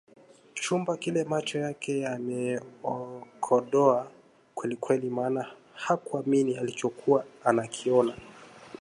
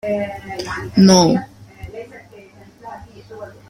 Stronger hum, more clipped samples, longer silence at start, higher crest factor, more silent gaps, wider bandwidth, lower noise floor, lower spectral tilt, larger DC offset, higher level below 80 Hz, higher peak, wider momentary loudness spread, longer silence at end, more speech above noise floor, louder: neither; neither; first, 0.55 s vs 0.05 s; about the same, 20 dB vs 18 dB; neither; second, 11.5 kHz vs 13 kHz; first, -47 dBFS vs -43 dBFS; about the same, -5.5 dB/octave vs -5 dB/octave; neither; second, -72 dBFS vs -46 dBFS; second, -8 dBFS vs 0 dBFS; second, 16 LU vs 27 LU; second, 0.05 s vs 0.2 s; second, 20 dB vs 28 dB; second, -29 LUFS vs -15 LUFS